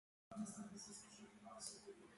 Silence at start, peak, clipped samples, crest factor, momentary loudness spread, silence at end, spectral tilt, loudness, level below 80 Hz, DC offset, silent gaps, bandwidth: 0.3 s; -34 dBFS; under 0.1%; 22 dB; 9 LU; 0 s; -3.5 dB/octave; -55 LUFS; -84 dBFS; under 0.1%; none; 11.5 kHz